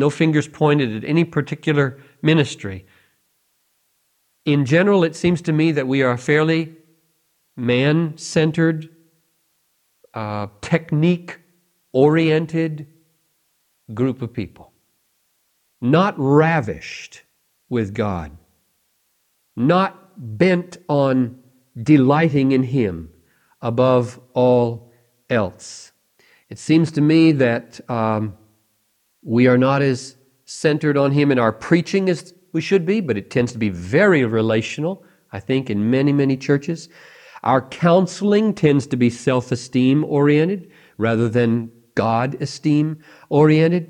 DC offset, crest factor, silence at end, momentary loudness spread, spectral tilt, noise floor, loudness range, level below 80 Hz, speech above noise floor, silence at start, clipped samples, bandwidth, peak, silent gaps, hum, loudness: under 0.1%; 18 dB; 0.05 s; 14 LU; -7 dB/octave; -66 dBFS; 4 LU; -58 dBFS; 49 dB; 0 s; under 0.1%; 10.5 kHz; 0 dBFS; none; none; -18 LUFS